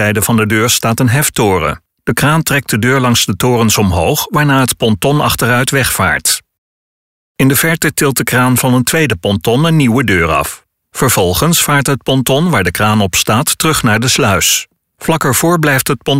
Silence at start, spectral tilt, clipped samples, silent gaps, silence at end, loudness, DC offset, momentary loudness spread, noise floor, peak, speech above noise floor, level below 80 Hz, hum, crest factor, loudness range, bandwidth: 0 s; -4 dB/octave; under 0.1%; 6.58-7.35 s; 0 s; -11 LUFS; 0.5%; 4 LU; under -90 dBFS; 0 dBFS; over 79 dB; -36 dBFS; none; 10 dB; 2 LU; 16.5 kHz